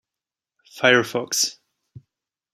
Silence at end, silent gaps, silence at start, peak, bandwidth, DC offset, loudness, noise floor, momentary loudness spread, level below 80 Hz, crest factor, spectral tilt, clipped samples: 1 s; none; 0.75 s; -2 dBFS; 15.5 kHz; under 0.1%; -20 LUFS; -89 dBFS; 7 LU; -70 dBFS; 24 dB; -2 dB/octave; under 0.1%